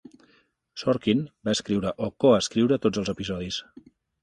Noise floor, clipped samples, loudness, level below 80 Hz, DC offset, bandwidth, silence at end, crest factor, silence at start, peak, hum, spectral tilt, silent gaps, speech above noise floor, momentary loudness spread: -64 dBFS; under 0.1%; -25 LUFS; -54 dBFS; under 0.1%; 11.5 kHz; 0.6 s; 20 dB; 0.75 s; -6 dBFS; none; -5.5 dB/octave; none; 39 dB; 10 LU